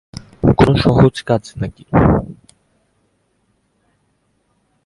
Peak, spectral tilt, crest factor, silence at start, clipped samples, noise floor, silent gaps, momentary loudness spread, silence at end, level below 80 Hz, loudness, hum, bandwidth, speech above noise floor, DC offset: 0 dBFS; -8 dB/octave; 18 dB; 0.45 s; under 0.1%; -63 dBFS; none; 15 LU; 2.5 s; -32 dBFS; -15 LUFS; none; 11.5 kHz; 49 dB; under 0.1%